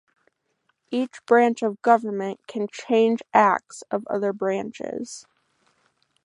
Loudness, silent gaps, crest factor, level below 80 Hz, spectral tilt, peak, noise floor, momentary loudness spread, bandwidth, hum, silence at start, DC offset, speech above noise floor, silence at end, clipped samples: -23 LUFS; none; 22 dB; -74 dBFS; -5 dB/octave; -2 dBFS; -72 dBFS; 13 LU; 11 kHz; none; 0.9 s; under 0.1%; 49 dB; 1.05 s; under 0.1%